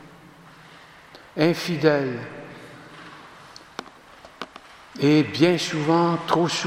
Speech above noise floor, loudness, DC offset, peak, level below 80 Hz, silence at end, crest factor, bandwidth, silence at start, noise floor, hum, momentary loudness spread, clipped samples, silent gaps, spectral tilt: 27 dB; -21 LUFS; under 0.1%; -4 dBFS; -66 dBFS; 0 s; 22 dB; 15.5 kHz; 0 s; -48 dBFS; none; 23 LU; under 0.1%; none; -5.5 dB/octave